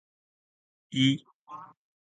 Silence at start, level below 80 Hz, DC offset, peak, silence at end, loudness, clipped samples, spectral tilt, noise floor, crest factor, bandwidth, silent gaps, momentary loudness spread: 0.9 s; -74 dBFS; under 0.1%; -12 dBFS; 0.45 s; -28 LUFS; under 0.1%; -5 dB/octave; -48 dBFS; 22 dB; 9.2 kHz; 1.35-1.46 s; 21 LU